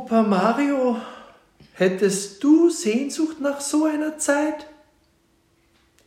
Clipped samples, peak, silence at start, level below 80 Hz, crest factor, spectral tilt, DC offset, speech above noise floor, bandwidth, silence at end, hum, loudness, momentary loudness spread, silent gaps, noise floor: under 0.1%; -6 dBFS; 0 s; -68 dBFS; 16 dB; -4.5 dB/octave; under 0.1%; 42 dB; 15.5 kHz; 1.35 s; none; -21 LUFS; 9 LU; none; -63 dBFS